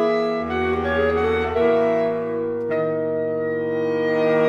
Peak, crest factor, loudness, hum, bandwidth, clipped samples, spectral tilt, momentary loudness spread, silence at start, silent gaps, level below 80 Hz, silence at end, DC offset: -8 dBFS; 14 dB; -21 LUFS; none; 7 kHz; under 0.1%; -7.5 dB/octave; 5 LU; 0 s; none; -44 dBFS; 0 s; under 0.1%